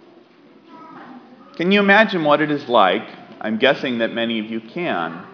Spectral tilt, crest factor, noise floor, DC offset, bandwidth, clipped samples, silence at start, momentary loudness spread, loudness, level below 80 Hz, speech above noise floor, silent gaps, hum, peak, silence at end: -6.5 dB/octave; 20 dB; -49 dBFS; under 0.1%; 5.4 kHz; under 0.1%; 0.7 s; 15 LU; -18 LUFS; -74 dBFS; 31 dB; none; none; 0 dBFS; 0 s